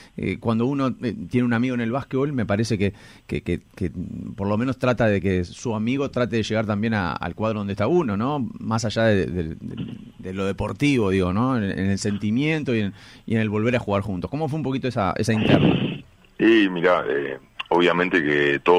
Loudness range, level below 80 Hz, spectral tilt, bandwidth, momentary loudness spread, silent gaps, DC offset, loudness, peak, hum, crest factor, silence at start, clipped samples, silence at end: 4 LU; -48 dBFS; -6.5 dB/octave; 11.5 kHz; 11 LU; none; under 0.1%; -23 LUFS; -2 dBFS; none; 20 dB; 0 s; under 0.1%; 0 s